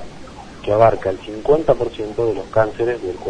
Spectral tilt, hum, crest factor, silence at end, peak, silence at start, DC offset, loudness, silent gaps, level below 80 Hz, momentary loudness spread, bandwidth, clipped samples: -7 dB/octave; none; 18 dB; 0 s; 0 dBFS; 0 s; under 0.1%; -18 LUFS; none; -40 dBFS; 17 LU; 10 kHz; under 0.1%